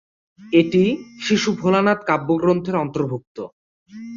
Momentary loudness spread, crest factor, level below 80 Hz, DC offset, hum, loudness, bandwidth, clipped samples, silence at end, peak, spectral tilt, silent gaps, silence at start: 17 LU; 18 dB; -58 dBFS; under 0.1%; none; -19 LUFS; 7.6 kHz; under 0.1%; 0 s; -4 dBFS; -6 dB/octave; 3.27-3.35 s, 3.52-3.86 s; 0.4 s